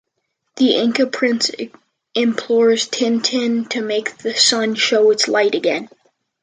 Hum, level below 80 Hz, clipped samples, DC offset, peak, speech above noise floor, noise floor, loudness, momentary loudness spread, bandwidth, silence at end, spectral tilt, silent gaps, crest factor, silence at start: none; -70 dBFS; under 0.1%; under 0.1%; 0 dBFS; 56 dB; -73 dBFS; -17 LUFS; 8 LU; 9.6 kHz; 0.55 s; -2.5 dB/octave; none; 18 dB; 0.55 s